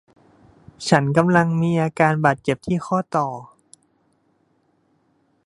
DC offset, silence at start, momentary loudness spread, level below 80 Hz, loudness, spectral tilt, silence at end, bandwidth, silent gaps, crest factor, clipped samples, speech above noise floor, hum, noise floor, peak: under 0.1%; 0.8 s; 8 LU; -56 dBFS; -20 LUFS; -6.5 dB/octave; 2 s; 11.5 kHz; none; 22 dB; under 0.1%; 45 dB; none; -64 dBFS; 0 dBFS